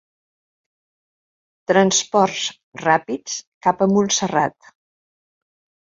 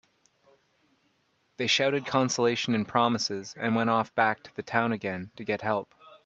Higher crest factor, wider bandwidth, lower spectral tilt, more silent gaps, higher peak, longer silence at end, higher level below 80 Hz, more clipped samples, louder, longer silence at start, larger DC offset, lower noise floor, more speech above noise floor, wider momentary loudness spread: about the same, 20 dB vs 22 dB; about the same, 7.8 kHz vs 8.2 kHz; about the same, -3.5 dB/octave vs -4 dB/octave; first, 2.63-2.72 s, 3.47-3.61 s vs none; first, -2 dBFS vs -8 dBFS; first, 1.45 s vs 0.1 s; first, -62 dBFS vs -70 dBFS; neither; first, -19 LUFS vs -27 LUFS; about the same, 1.7 s vs 1.6 s; neither; first, under -90 dBFS vs -71 dBFS; first, over 72 dB vs 44 dB; first, 11 LU vs 8 LU